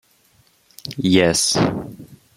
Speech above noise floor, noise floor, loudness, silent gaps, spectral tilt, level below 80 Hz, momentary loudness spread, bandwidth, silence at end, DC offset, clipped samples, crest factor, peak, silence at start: 39 dB; -58 dBFS; -17 LUFS; none; -4 dB/octave; -50 dBFS; 20 LU; 16 kHz; 0.2 s; under 0.1%; under 0.1%; 20 dB; -2 dBFS; 0.85 s